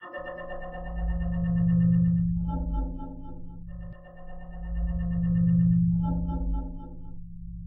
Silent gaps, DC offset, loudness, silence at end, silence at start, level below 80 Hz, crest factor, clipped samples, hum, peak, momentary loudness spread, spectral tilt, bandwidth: none; under 0.1%; -27 LUFS; 0 s; 0 s; -34 dBFS; 14 dB; under 0.1%; none; -14 dBFS; 22 LU; -13 dB/octave; 3 kHz